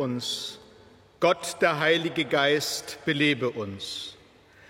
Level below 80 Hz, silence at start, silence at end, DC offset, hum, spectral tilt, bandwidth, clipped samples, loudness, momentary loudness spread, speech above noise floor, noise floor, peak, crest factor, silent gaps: -66 dBFS; 0 s; 0.55 s; under 0.1%; none; -3.5 dB/octave; 16.5 kHz; under 0.1%; -26 LUFS; 12 LU; 28 dB; -55 dBFS; -8 dBFS; 18 dB; none